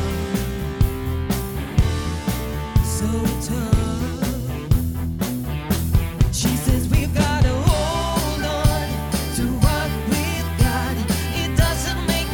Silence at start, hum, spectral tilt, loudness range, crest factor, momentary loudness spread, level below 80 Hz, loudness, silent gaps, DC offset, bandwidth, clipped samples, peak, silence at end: 0 s; none; -5.5 dB/octave; 3 LU; 16 dB; 5 LU; -26 dBFS; -22 LUFS; none; under 0.1%; 20 kHz; under 0.1%; -4 dBFS; 0 s